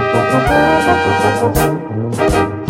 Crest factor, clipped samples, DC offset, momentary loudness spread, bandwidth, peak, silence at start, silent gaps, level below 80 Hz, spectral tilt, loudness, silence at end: 12 dB; under 0.1%; under 0.1%; 5 LU; 16.5 kHz; 0 dBFS; 0 s; none; -30 dBFS; -5.5 dB/octave; -13 LUFS; 0 s